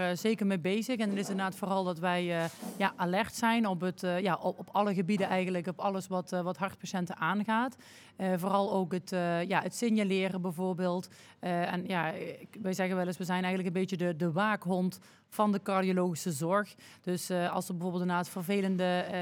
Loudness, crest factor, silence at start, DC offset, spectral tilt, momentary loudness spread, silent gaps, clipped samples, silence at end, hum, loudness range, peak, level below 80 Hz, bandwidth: -32 LUFS; 20 dB; 0 s; under 0.1%; -5.5 dB/octave; 7 LU; none; under 0.1%; 0 s; none; 2 LU; -12 dBFS; -78 dBFS; 17 kHz